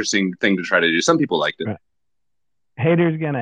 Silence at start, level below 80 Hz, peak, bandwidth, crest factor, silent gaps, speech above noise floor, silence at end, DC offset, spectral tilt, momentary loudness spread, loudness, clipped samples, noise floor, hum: 0 s; -66 dBFS; -2 dBFS; 9.6 kHz; 18 dB; none; 64 dB; 0 s; under 0.1%; -4.5 dB/octave; 11 LU; -19 LUFS; under 0.1%; -83 dBFS; none